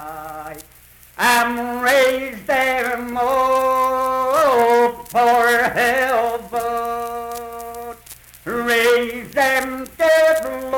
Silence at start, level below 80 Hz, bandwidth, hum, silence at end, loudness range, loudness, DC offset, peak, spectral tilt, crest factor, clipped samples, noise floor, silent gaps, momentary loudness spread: 0 s; -50 dBFS; 19 kHz; none; 0 s; 5 LU; -17 LUFS; under 0.1%; -6 dBFS; -2.5 dB/octave; 14 dB; under 0.1%; -47 dBFS; none; 17 LU